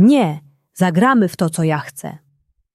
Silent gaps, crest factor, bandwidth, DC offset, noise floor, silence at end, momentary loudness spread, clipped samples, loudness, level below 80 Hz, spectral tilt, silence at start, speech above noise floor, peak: none; 14 dB; 14.5 kHz; under 0.1%; -62 dBFS; 0.6 s; 19 LU; under 0.1%; -16 LUFS; -60 dBFS; -6.5 dB/octave; 0 s; 47 dB; -2 dBFS